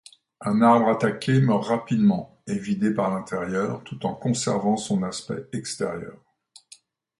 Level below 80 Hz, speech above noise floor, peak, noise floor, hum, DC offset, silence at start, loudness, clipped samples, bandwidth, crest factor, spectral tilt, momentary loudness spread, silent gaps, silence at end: -62 dBFS; 31 dB; -6 dBFS; -54 dBFS; none; under 0.1%; 0.4 s; -24 LUFS; under 0.1%; 11.5 kHz; 18 dB; -6 dB/octave; 12 LU; none; 1.05 s